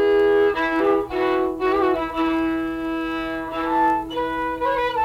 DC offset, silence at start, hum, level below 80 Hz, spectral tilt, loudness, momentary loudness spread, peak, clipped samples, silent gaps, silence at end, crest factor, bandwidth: under 0.1%; 0 s; none; -46 dBFS; -6 dB/octave; -21 LUFS; 8 LU; -8 dBFS; under 0.1%; none; 0 s; 12 dB; 15.5 kHz